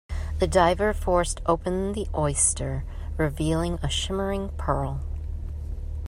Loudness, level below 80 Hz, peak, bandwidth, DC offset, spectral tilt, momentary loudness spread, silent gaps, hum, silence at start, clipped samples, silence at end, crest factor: -26 LUFS; -32 dBFS; -6 dBFS; 15 kHz; under 0.1%; -4.5 dB/octave; 14 LU; none; none; 0.1 s; under 0.1%; 0 s; 20 dB